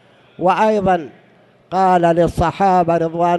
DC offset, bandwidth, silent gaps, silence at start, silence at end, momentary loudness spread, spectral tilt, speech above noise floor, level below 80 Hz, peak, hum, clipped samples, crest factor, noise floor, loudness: under 0.1%; 12 kHz; none; 0.4 s; 0 s; 7 LU; -7 dB/octave; 36 dB; -40 dBFS; -2 dBFS; none; under 0.1%; 14 dB; -50 dBFS; -16 LUFS